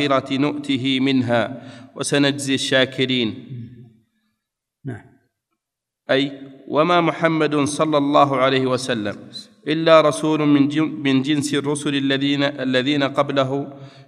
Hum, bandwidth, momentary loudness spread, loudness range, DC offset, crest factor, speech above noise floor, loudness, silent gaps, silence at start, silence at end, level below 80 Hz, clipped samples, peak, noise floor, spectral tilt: none; 12.5 kHz; 18 LU; 8 LU; under 0.1%; 18 dB; 65 dB; -19 LUFS; none; 0 s; 0.05 s; -68 dBFS; under 0.1%; 0 dBFS; -84 dBFS; -5 dB/octave